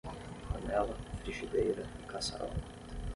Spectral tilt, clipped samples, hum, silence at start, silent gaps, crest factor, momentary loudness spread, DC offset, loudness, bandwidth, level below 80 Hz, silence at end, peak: -5 dB/octave; under 0.1%; none; 0.05 s; none; 18 dB; 12 LU; under 0.1%; -38 LUFS; 11.5 kHz; -46 dBFS; 0 s; -18 dBFS